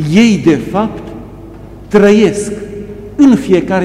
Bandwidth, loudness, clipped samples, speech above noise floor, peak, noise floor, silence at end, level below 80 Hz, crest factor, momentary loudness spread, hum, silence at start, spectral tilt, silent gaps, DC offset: 12.5 kHz; -10 LUFS; under 0.1%; 22 dB; 0 dBFS; -31 dBFS; 0 s; -36 dBFS; 12 dB; 19 LU; none; 0 s; -6.5 dB/octave; none; under 0.1%